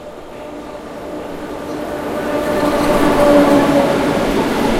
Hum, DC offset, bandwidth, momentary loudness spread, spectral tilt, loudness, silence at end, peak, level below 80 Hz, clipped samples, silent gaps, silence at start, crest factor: none; under 0.1%; 16.5 kHz; 19 LU; -5.5 dB/octave; -14 LUFS; 0 s; 0 dBFS; -34 dBFS; under 0.1%; none; 0 s; 16 dB